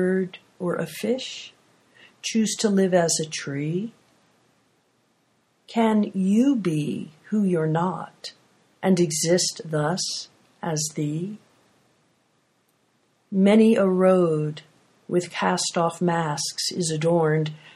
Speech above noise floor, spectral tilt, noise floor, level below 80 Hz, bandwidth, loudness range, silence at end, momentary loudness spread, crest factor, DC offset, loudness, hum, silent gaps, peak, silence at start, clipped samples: 44 dB; -5 dB/octave; -67 dBFS; -70 dBFS; 14.5 kHz; 6 LU; 0.05 s; 15 LU; 18 dB; under 0.1%; -23 LUFS; none; none; -6 dBFS; 0 s; under 0.1%